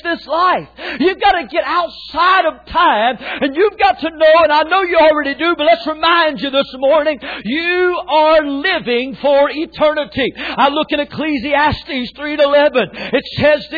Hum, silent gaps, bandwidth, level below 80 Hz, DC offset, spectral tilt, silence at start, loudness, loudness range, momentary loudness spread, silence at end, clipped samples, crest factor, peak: none; none; 4.9 kHz; -44 dBFS; under 0.1%; -6.5 dB/octave; 0.05 s; -14 LUFS; 3 LU; 8 LU; 0 s; under 0.1%; 12 dB; -2 dBFS